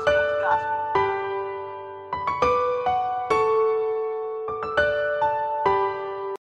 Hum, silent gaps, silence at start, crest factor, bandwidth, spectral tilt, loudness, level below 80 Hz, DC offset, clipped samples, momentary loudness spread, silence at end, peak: none; none; 0 s; 16 dB; 9.6 kHz; -5 dB/octave; -24 LUFS; -52 dBFS; under 0.1%; under 0.1%; 9 LU; 0.15 s; -8 dBFS